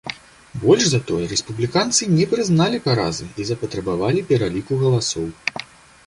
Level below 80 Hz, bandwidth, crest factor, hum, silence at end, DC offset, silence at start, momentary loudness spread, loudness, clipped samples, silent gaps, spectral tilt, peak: -48 dBFS; 11.5 kHz; 20 dB; none; 0.4 s; under 0.1%; 0.05 s; 10 LU; -20 LUFS; under 0.1%; none; -4.5 dB/octave; 0 dBFS